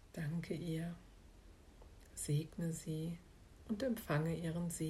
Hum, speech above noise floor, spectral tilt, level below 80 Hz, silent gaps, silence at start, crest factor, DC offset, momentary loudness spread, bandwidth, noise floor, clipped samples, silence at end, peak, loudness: none; 20 dB; -6 dB/octave; -62 dBFS; none; 0.05 s; 18 dB; under 0.1%; 23 LU; 15.5 kHz; -60 dBFS; under 0.1%; 0 s; -24 dBFS; -42 LUFS